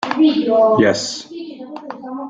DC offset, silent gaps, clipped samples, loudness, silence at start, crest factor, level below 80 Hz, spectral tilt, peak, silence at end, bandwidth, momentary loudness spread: under 0.1%; none; under 0.1%; -15 LUFS; 0 s; 14 dB; -58 dBFS; -4.5 dB/octave; -2 dBFS; 0 s; 9.2 kHz; 19 LU